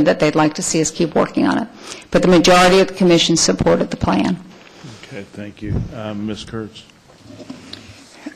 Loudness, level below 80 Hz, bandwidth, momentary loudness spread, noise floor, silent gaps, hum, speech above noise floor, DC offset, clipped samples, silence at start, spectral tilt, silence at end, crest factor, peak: -15 LUFS; -40 dBFS; 15 kHz; 23 LU; -40 dBFS; none; none; 24 dB; under 0.1%; under 0.1%; 0 s; -4.5 dB/octave; 0.05 s; 14 dB; -4 dBFS